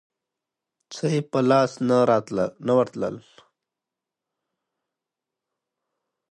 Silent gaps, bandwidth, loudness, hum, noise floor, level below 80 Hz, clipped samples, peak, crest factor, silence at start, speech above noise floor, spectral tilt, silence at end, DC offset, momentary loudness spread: none; 10.5 kHz; -22 LUFS; none; -87 dBFS; -66 dBFS; under 0.1%; -6 dBFS; 20 dB; 0.9 s; 65 dB; -6.5 dB/octave; 3.15 s; under 0.1%; 11 LU